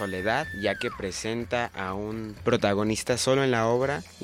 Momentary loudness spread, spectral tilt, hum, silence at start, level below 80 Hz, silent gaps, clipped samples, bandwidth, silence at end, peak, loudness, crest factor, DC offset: 9 LU; -4.5 dB/octave; none; 0 s; -52 dBFS; none; under 0.1%; 16.5 kHz; 0 s; -10 dBFS; -27 LUFS; 18 dB; under 0.1%